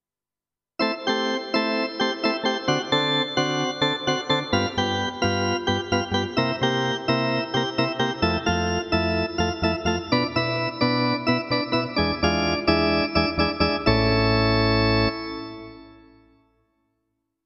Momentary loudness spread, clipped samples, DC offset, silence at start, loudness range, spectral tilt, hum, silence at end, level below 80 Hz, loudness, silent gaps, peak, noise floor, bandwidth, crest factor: 5 LU; under 0.1%; under 0.1%; 0.8 s; 2 LU; -5.5 dB/octave; none; 1.5 s; -40 dBFS; -23 LUFS; none; -6 dBFS; under -90 dBFS; 8.4 kHz; 18 dB